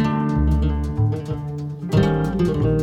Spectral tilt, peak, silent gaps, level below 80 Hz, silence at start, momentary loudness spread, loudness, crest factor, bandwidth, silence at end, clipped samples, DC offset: -8.5 dB/octave; -6 dBFS; none; -26 dBFS; 0 s; 9 LU; -21 LUFS; 14 dB; 10 kHz; 0 s; under 0.1%; under 0.1%